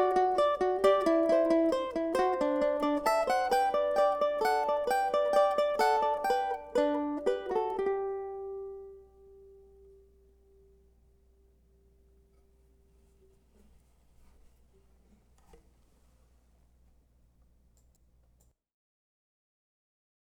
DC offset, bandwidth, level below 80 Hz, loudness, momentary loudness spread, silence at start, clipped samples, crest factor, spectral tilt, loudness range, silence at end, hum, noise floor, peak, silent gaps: under 0.1%; 18.5 kHz; -62 dBFS; -29 LUFS; 9 LU; 0 s; under 0.1%; 20 dB; -4 dB/octave; 12 LU; 11.3 s; 60 Hz at -65 dBFS; -68 dBFS; -12 dBFS; none